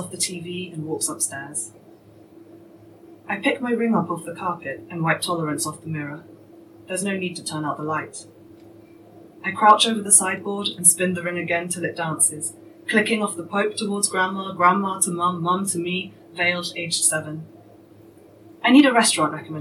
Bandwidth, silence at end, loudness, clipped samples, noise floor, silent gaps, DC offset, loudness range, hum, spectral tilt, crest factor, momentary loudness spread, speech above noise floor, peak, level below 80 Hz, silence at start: 16 kHz; 0 s; -21 LUFS; under 0.1%; -48 dBFS; none; under 0.1%; 10 LU; none; -3 dB/octave; 22 dB; 16 LU; 26 dB; 0 dBFS; -72 dBFS; 0 s